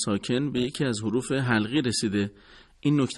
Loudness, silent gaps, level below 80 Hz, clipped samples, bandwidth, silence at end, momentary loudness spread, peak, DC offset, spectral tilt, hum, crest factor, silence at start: -26 LUFS; none; -56 dBFS; under 0.1%; 12 kHz; 0 s; 5 LU; -10 dBFS; under 0.1%; -5 dB/octave; none; 16 dB; 0 s